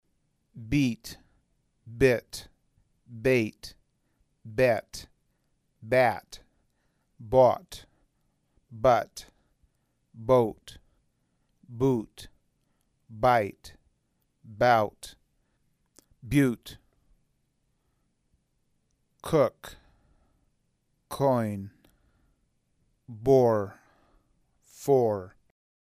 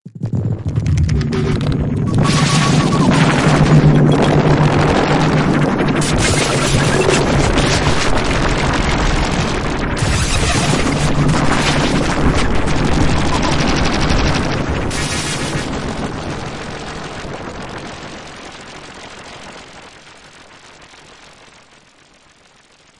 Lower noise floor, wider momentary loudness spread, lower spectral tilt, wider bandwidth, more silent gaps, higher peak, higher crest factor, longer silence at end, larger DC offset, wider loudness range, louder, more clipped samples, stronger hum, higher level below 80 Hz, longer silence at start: first, -74 dBFS vs -49 dBFS; first, 23 LU vs 16 LU; first, -6.5 dB/octave vs -5 dB/octave; first, 15.5 kHz vs 11.5 kHz; neither; second, -8 dBFS vs 0 dBFS; first, 22 dB vs 16 dB; second, 0.7 s vs 1.75 s; neither; second, 6 LU vs 17 LU; second, -26 LUFS vs -15 LUFS; neither; neither; second, -56 dBFS vs -26 dBFS; first, 0.55 s vs 0.05 s